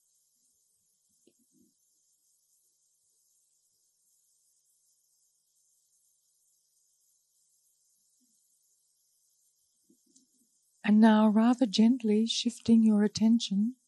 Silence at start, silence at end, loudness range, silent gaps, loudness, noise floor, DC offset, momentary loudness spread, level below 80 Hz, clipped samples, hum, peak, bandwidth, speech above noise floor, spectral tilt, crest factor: 10.85 s; 0.15 s; 6 LU; none; -25 LUFS; -73 dBFS; under 0.1%; 8 LU; -74 dBFS; under 0.1%; none; -10 dBFS; 10.5 kHz; 49 dB; -5.5 dB/octave; 20 dB